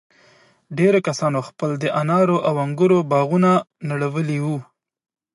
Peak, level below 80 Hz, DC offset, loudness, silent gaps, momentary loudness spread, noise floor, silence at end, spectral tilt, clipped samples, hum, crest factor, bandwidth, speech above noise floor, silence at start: -4 dBFS; -68 dBFS; under 0.1%; -19 LUFS; none; 9 LU; -54 dBFS; 0.7 s; -7 dB/octave; under 0.1%; none; 16 dB; 11 kHz; 36 dB; 0.7 s